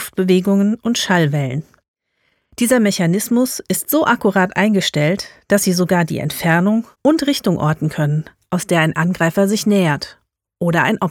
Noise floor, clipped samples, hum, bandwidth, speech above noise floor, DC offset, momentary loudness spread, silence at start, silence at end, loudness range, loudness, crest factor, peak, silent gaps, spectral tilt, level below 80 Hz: -66 dBFS; under 0.1%; none; 18.5 kHz; 50 dB; under 0.1%; 7 LU; 0 s; 0 s; 2 LU; -16 LUFS; 14 dB; -2 dBFS; 1.88-1.94 s; -5 dB/octave; -54 dBFS